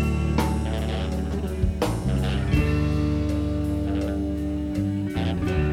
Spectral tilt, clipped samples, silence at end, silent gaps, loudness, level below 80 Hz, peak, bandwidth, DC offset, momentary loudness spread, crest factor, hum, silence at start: -7 dB/octave; under 0.1%; 0 s; none; -25 LUFS; -30 dBFS; -8 dBFS; 15 kHz; under 0.1%; 4 LU; 14 dB; none; 0 s